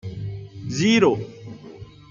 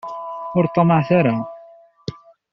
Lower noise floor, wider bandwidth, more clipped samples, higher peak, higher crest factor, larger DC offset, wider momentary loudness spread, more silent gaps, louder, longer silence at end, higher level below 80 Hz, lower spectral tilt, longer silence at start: second, -42 dBFS vs -46 dBFS; first, 7.6 kHz vs 6.4 kHz; neither; about the same, -4 dBFS vs -4 dBFS; about the same, 20 dB vs 16 dB; neither; first, 24 LU vs 19 LU; neither; about the same, -20 LUFS vs -18 LUFS; second, 0.2 s vs 0.35 s; about the same, -54 dBFS vs -56 dBFS; second, -5.5 dB/octave vs -7.5 dB/octave; about the same, 0.05 s vs 0.05 s